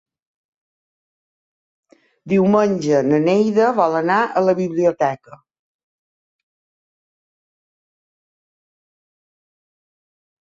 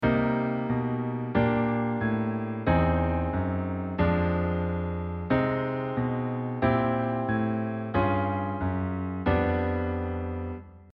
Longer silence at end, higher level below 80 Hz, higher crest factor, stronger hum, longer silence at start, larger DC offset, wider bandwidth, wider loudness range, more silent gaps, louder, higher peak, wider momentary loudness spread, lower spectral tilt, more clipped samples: first, 5.1 s vs 0.05 s; second, -66 dBFS vs -46 dBFS; about the same, 18 dB vs 18 dB; neither; first, 2.25 s vs 0 s; neither; first, 7.8 kHz vs 5.2 kHz; first, 8 LU vs 1 LU; neither; first, -17 LUFS vs -28 LUFS; first, -4 dBFS vs -10 dBFS; about the same, 5 LU vs 6 LU; second, -7 dB/octave vs -11 dB/octave; neither